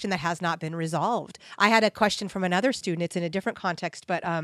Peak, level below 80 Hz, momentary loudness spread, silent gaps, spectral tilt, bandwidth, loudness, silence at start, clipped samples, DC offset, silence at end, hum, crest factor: -4 dBFS; -64 dBFS; 9 LU; none; -4.5 dB/octave; 13.5 kHz; -26 LUFS; 0 s; under 0.1%; under 0.1%; 0 s; none; 22 dB